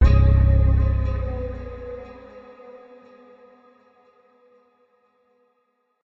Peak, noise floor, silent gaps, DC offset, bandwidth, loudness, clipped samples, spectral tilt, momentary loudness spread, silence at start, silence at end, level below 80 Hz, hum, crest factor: -6 dBFS; -70 dBFS; none; under 0.1%; 5.6 kHz; -21 LUFS; under 0.1%; -9.5 dB/octave; 27 LU; 0 s; 3.3 s; -24 dBFS; none; 16 dB